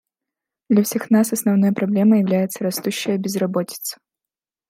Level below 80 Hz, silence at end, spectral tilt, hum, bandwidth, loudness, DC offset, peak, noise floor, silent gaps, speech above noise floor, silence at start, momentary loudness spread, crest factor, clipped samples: -70 dBFS; 0.75 s; -5.5 dB/octave; none; 16 kHz; -19 LUFS; under 0.1%; -4 dBFS; -88 dBFS; none; 70 dB; 0.7 s; 8 LU; 16 dB; under 0.1%